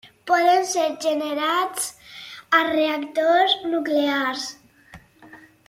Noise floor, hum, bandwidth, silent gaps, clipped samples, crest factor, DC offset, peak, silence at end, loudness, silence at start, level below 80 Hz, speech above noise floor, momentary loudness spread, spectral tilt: -49 dBFS; none; 16.5 kHz; none; under 0.1%; 18 dB; under 0.1%; -4 dBFS; 0.3 s; -21 LUFS; 0.05 s; -66 dBFS; 28 dB; 12 LU; -1.5 dB/octave